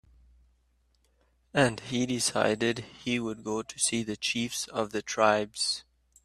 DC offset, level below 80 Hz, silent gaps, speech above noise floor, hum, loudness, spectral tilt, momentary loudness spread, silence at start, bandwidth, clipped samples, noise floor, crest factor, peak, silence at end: under 0.1%; -62 dBFS; none; 40 dB; none; -29 LUFS; -3 dB/octave; 8 LU; 1.55 s; 15 kHz; under 0.1%; -69 dBFS; 24 dB; -6 dBFS; 0.45 s